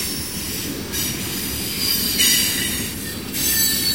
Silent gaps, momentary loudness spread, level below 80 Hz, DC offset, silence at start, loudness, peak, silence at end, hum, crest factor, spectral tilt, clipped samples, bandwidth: none; 11 LU; -42 dBFS; 0.4%; 0 s; -19 LUFS; -4 dBFS; 0 s; none; 18 dB; -1.5 dB/octave; under 0.1%; 16.5 kHz